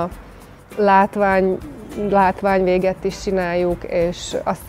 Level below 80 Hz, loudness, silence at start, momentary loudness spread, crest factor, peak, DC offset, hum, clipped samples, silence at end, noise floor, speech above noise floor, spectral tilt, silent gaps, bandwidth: -40 dBFS; -18 LUFS; 0 s; 12 LU; 18 dB; -2 dBFS; under 0.1%; none; under 0.1%; 0 s; -40 dBFS; 22 dB; -6 dB/octave; none; 15.5 kHz